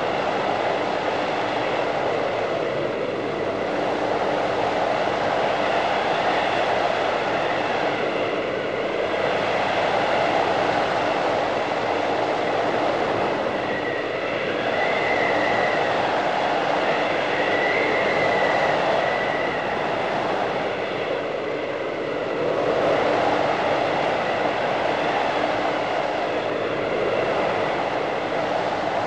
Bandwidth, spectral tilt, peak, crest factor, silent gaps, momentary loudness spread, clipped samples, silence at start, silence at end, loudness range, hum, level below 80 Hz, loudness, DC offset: 9.8 kHz; -5 dB/octave; -8 dBFS; 14 dB; none; 5 LU; under 0.1%; 0 s; 0 s; 3 LU; none; -54 dBFS; -22 LUFS; 0.2%